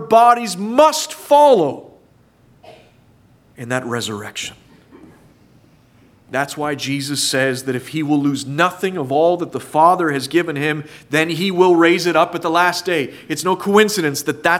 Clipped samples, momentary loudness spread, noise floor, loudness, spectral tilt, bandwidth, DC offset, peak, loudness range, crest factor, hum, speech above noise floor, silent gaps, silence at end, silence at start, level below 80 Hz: under 0.1%; 11 LU; -52 dBFS; -17 LUFS; -4 dB/octave; 16.5 kHz; under 0.1%; 0 dBFS; 13 LU; 18 dB; none; 36 dB; none; 0 s; 0 s; -62 dBFS